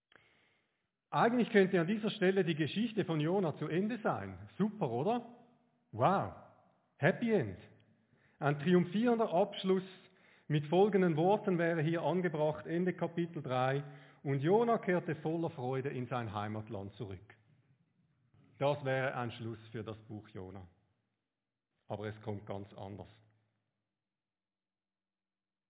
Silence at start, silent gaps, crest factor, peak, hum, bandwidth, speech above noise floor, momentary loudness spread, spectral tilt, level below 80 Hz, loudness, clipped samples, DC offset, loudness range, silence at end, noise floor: 1.1 s; none; 22 dB; -14 dBFS; none; 4 kHz; over 56 dB; 17 LU; -6 dB/octave; -70 dBFS; -34 LUFS; under 0.1%; under 0.1%; 15 LU; 2.65 s; under -90 dBFS